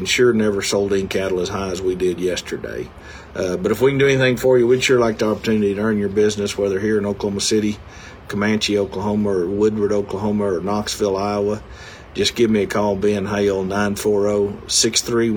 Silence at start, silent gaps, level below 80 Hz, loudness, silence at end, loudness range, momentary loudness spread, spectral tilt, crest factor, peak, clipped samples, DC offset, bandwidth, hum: 0 s; none; -44 dBFS; -19 LUFS; 0 s; 4 LU; 11 LU; -4.5 dB/octave; 16 dB; -4 dBFS; under 0.1%; under 0.1%; 20 kHz; none